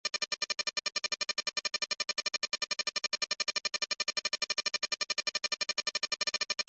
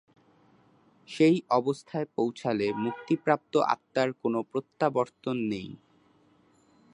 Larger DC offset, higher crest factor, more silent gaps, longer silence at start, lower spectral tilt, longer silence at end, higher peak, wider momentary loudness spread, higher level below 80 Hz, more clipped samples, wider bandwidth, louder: neither; second, 16 dB vs 22 dB; neither; second, 0.05 s vs 1.1 s; second, 2 dB/octave vs -6.5 dB/octave; second, 0.05 s vs 1.2 s; second, -18 dBFS vs -8 dBFS; second, 2 LU vs 9 LU; second, -80 dBFS vs -72 dBFS; neither; second, 8.6 kHz vs 10.5 kHz; second, -32 LUFS vs -28 LUFS